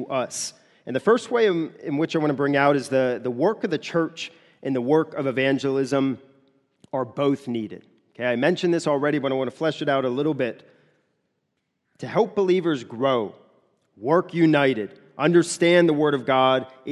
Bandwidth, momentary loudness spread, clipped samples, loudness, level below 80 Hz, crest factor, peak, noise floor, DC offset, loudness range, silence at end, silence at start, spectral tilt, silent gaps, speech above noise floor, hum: 12 kHz; 11 LU; under 0.1%; -23 LUFS; -72 dBFS; 18 dB; -4 dBFS; -76 dBFS; under 0.1%; 5 LU; 0 s; 0 s; -5.5 dB/octave; none; 54 dB; none